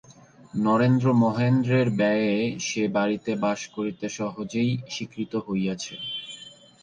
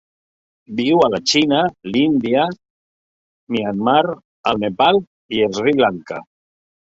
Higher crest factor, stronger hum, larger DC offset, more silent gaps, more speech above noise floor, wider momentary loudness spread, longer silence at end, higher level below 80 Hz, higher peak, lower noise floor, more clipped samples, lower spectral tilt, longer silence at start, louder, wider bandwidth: about the same, 14 dB vs 18 dB; neither; neither; second, none vs 2.70-3.47 s, 4.25-4.44 s, 5.07-5.29 s; second, 26 dB vs over 73 dB; about the same, 12 LU vs 10 LU; second, 0.35 s vs 0.6 s; second, -62 dBFS vs -56 dBFS; second, -10 dBFS vs 0 dBFS; second, -50 dBFS vs under -90 dBFS; neither; first, -6 dB/octave vs -4.5 dB/octave; second, 0.1 s vs 0.7 s; second, -25 LUFS vs -17 LUFS; first, 9.4 kHz vs 8 kHz